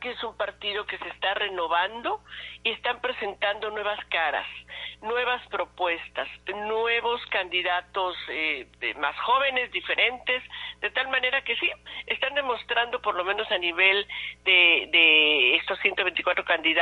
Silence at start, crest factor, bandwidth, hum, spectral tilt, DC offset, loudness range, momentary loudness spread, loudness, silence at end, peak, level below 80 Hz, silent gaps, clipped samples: 0 s; 20 dB; 10.5 kHz; 60 Hz at -60 dBFS; -3.5 dB/octave; under 0.1%; 9 LU; 14 LU; -24 LUFS; 0 s; -6 dBFS; -60 dBFS; none; under 0.1%